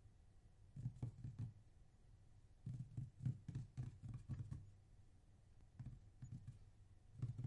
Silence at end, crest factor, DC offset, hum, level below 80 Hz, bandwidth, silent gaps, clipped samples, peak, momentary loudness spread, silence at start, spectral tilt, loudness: 0 s; 20 dB; under 0.1%; none; -66 dBFS; 10.5 kHz; none; under 0.1%; -34 dBFS; 16 LU; 0 s; -8.5 dB/octave; -54 LUFS